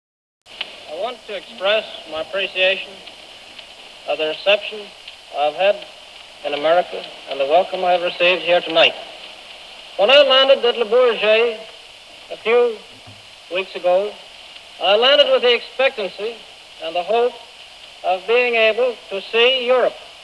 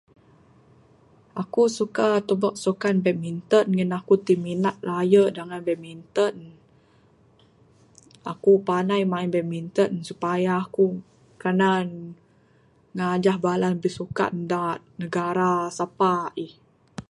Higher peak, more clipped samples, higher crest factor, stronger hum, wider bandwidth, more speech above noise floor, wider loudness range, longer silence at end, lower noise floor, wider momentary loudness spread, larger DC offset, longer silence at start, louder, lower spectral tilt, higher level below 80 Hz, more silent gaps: about the same, -2 dBFS vs -4 dBFS; neither; about the same, 18 dB vs 20 dB; neither; about the same, 11 kHz vs 11.5 kHz; second, 24 dB vs 36 dB; first, 7 LU vs 4 LU; about the same, 0 s vs 0.1 s; second, -41 dBFS vs -59 dBFS; first, 24 LU vs 13 LU; neither; second, 0.5 s vs 1.35 s; first, -17 LUFS vs -24 LUFS; second, -2.5 dB/octave vs -6.5 dB/octave; about the same, -64 dBFS vs -66 dBFS; neither